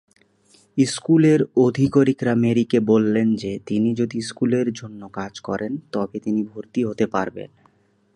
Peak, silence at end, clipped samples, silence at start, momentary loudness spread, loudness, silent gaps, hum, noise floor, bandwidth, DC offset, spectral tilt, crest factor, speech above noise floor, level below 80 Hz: -4 dBFS; 0.7 s; under 0.1%; 0.75 s; 13 LU; -21 LUFS; none; none; -60 dBFS; 11 kHz; under 0.1%; -6.5 dB/octave; 16 dB; 40 dB; -58 dBFS